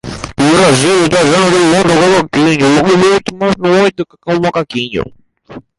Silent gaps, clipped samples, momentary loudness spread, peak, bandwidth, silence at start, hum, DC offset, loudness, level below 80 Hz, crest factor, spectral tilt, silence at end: none; under 0.1%; 9 LU; 0 dBFS; 11.5 kHz; 0.05 s; none; under 0.1%; -10 LUFS; -40 dBFS; 10 dB; -4.5 dB/octave; 0.2 s